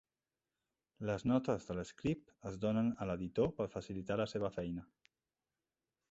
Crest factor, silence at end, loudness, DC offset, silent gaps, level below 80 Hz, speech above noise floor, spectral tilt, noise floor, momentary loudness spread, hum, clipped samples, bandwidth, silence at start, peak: 20 dB; 1.25 s; -39 LUFS; under 0.1%; none; -62 dBFS; over 52 dB; -7 dB/octave; under -90 dBFS; 10 LU; none; under 0.1%; 8 kHz; 1 s; -20 dBFS